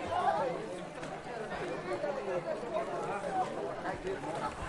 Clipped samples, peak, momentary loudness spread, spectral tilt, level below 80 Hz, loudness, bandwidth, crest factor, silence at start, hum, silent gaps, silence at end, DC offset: under 0.1%; -18 dBFS; 9 LU; -5.5 dB/octave; -60 dBFS; -37 LUFS; 11.5 kHz; 18 dB; 0 s; none; none; 0 s; under 0.1%